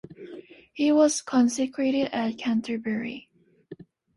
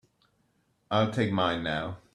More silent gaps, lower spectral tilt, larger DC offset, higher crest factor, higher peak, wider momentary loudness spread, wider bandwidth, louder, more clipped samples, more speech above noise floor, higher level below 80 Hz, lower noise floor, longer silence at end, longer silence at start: neither; second, -4 dB/octave vs -6.5 dB/octave; neither; about the same, 18 dB vs 18 dB; first, -8 dBFS vs -12 dBFS; first, 22 LU vs 5 LU; about the same, 11.5 kHz vs 11.5 kHz; first, -25 LUFS vs -28 LUFS; neither; second, 24 dB vs 43 dB; second, -68 dBFS vs -60 dBFS; second, -48 dBFS vs -71 dBFS; first, 0.4 s vs 0.15 s; second, 0.1 s vs 0.9 s